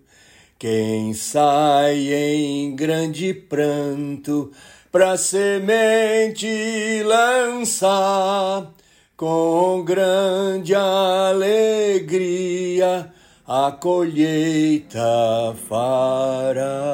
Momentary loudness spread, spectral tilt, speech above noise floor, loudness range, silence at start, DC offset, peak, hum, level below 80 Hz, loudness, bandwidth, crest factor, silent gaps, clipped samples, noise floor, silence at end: 8 LU; -4.5 dB/octave; 33 dB; 2 LU; 0.6 s; under 0.1%; -4 dBFS; none; -64 dBFS; -19 LUFS; 16.5 kHz; 16 dB; none; under 0.1%; -51 dBFS; 0 s